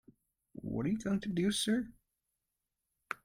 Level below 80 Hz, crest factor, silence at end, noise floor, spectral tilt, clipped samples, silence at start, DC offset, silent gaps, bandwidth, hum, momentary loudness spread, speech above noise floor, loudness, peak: -64 dBFS; 20 dB; 0.1 s; -87 dBFS; -5 dB/octave; under 0.1%; 0.55 s; under 0.1%; none; 16 kHz; none; 15 LU; 54 dB; -35 LUFS; -18 dBFS